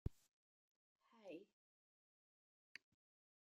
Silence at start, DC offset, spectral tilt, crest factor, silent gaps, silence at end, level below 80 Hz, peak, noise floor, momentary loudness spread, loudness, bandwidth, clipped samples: 0.05 s; under 0.1%; -6.5 dB/octave; 32 dB; 0.31-0.96 s; 1.95 s; -68 dBFS; -30 dBFS; under -90 dBFS; 7 LU; -60 LUFS; 14.5 kHz; under 0.1%